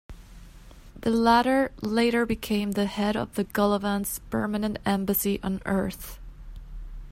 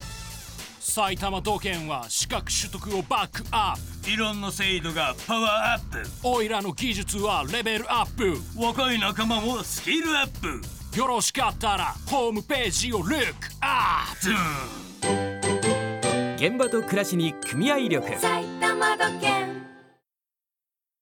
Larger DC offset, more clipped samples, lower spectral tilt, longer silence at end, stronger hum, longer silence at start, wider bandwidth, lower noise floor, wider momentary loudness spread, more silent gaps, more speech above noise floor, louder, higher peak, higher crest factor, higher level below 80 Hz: neither; neither; first, -5 dB/octave vs -3 dB/octave; second, 0 s vs 1.2 s; neither; about the same, 0.1 s vs 0 s; second, 16 kHz vs 19 kHz; second, -47 dBFS vs under -90 dBFS; first, 21 LU vs 7 LU; neither; second, 22 dB vs over 64 dB; about the same, -26 LUFS vs -25 LUFS; about the same, -6 dBFS vs -6 dBFS; about the same, 20 dB vs 20 dB; about the same, -44 dBFS vs -44 dBFS